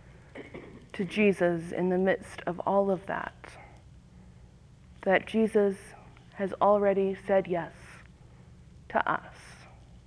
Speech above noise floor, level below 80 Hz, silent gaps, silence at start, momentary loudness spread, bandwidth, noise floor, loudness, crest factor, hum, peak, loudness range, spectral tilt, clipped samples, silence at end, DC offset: 26 dB; -58 dBFS; none; 0.35 s; 24 LU; 11 kHz; -54 dBFS; -28 LUFS; 20 dB; none; -10 dBFS; 4 LU; -7 dB/octave; under 0.1%; 0.1 s; under 0.1%